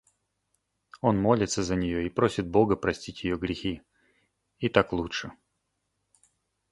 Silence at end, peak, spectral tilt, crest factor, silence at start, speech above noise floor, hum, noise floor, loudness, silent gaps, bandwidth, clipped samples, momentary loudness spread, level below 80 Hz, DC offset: 1.4 s; -4 dBFS; -5.5 dB/octave; 24 dB; 0.95 s; 52 dB; none; -79 dBFS; -27 LUFS; none; 11.5 kHz; under 0.1%; 10 LU; -50 dBFS; under 0.1%